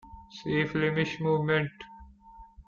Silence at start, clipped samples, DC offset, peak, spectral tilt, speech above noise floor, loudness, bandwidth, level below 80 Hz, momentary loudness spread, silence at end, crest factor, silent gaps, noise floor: 0.05 s; under 0.1%; under 0.1%; -12 dBFS; -7 dB/octave; 24 dB; -28 LUFS; 7 kHz; -56 dBFS; 21 LU; 0.05 s; 18 dB; none; -52 dBFS